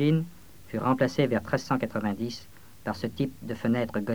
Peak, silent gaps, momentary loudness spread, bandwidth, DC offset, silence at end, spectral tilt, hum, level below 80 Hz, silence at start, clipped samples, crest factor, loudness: -10 dBFS; none; 11 LU; over 20 kHz; 0.3%; 0 s; -7 dB/octave; none; -58 dBFS; 0 s; under 0.1%; 18 dB; -29 LUFS